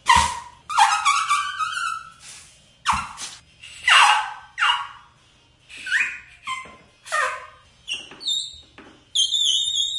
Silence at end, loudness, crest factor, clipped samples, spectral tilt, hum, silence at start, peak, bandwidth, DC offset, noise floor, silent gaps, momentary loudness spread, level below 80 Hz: 0 s; -20 LUFS; 22 dB; under 0.1%; 0.5 dB/octave; none; 0.05 s; -2 dBFS; 11.5 kHz; under 0.1%; -56 dBFS; none; 19 LU; -50 dBFS